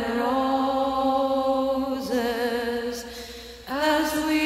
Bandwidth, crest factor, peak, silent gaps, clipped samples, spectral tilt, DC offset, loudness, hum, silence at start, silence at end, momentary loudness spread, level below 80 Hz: 16 kHz; 16 dB; -8 dBFS; none; under 0.1%; -3.5 dB/octave; under 0.1%; -25 LUFS; none; 0 s; 0 s; 12 LU; -50 dBFS